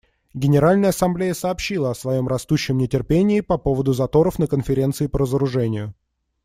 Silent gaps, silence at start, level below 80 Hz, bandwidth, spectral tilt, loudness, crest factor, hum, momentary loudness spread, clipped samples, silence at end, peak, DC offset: none; 0.35 s; -40 dBFS; 16 kHz; -7 dB/octave; -20 LUFS; 14 dB; none; 7 LU; under 0.1%; 0.55 s; -4 dBFS; under 0.1%